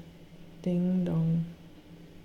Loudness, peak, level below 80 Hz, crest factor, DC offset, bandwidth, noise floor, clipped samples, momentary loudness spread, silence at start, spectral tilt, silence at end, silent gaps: -30 LUFS; -20 dBFS; -58 dBFS; 12 dB; under 0.1%; 6.4 kHz; -50 dBFS; under 0.1%; 23 LU; 0 s; -10 dB/octave; 0 s; none